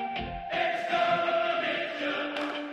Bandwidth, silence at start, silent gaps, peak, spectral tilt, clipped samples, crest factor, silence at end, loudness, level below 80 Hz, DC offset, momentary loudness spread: 9.8 kHz; 0 s; none; -14 dBFS; -4.5 dB/octave; under 0.1%; 14 dB; 0 s; -29 LUFS; -54 dBFS; under 0.1%; 7 LU